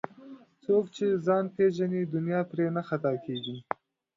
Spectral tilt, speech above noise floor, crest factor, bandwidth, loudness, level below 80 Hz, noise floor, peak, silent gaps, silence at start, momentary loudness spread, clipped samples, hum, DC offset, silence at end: -7.5 dB/octave; 22 dB; 20 dB; 7.6 kHz; -29 LUFS; -74 dBFS; -50 dBFS; -10 dBFS; none; 0.2 s; 12 LU; under 0.1%; none; under 0.1%; 0.55 s